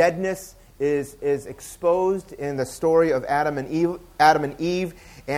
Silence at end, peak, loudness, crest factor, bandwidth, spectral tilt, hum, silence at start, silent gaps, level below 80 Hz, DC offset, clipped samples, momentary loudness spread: 0 s; -2 dBFS; -23 LUFS; 22 dB; 16 kHz; -5.5 dB/octave; none; 0 s; none; -52 dBFS; under 0.1%; under 0.1%; 12 LU